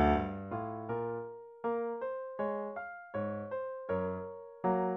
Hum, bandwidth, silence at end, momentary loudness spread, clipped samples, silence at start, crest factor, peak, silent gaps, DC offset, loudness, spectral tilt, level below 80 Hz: none; 6 kHz; 0 s; 8 LU; under 0.1%; 0 s; 20 dB; -16 dBFS; none; under 0.1%; -37 LUFS; -6.5 dB/octave; -50 dBFS